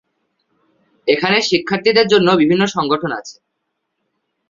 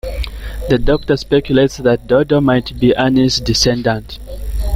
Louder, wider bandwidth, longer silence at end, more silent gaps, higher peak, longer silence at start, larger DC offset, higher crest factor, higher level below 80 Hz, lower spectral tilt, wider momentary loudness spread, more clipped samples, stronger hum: about the same, -15 LUFS vs -14 LUFS; second, 7.6 kHz vs 16 kHz; first, 1.15 s vs 0 s; neither; about the same, 0 dBFS vs 0 dBFS; first, 1.05 s vs 0.05 s; neither; about the same, 16 dB vs 14 dB; second, -58 dBFS vs -26 dBFS; about the same, -4.5 dB/octave vs -5.5 dB/octave; second, 10 LU vs 13 LU; neither; neither